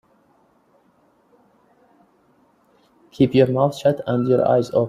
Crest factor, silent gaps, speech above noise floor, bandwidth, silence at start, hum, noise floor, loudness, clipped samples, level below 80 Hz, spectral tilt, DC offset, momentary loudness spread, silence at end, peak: 18 dB; none; 42 dB; 14 kHz; 3.2 s; none; -59 dBFS; -18 LUFS; under 0.1%; -58 dBFS; -8 dB/octave; under 0.1%; 5 LU; 0 s; -4 dBFS